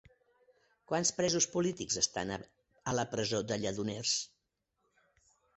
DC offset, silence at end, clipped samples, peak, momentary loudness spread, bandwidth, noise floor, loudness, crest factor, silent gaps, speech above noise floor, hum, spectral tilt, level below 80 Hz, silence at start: under 0.1%; 1.3 s; under 0.1%; -14 dBFS; 9 LU; 8.4 kHz; -83 dBFS; -33 LUFS; 22 dB; none; 49 dB; none; -3 dB/octave; -66 dBFS; 0.9 s